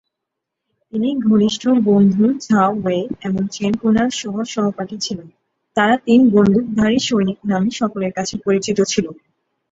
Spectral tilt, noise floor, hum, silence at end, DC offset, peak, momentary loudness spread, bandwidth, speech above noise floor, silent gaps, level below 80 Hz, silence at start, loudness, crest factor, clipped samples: -5.5 dB/octave; -80 dBFS; none; 0.6 s; under 0.1%; -2 dBFS; 10 LU; 7.8 kHz; 64 dB; none; -50 dBFS; 0.95 s; -17 LUFS; 16 dB; under 0.1%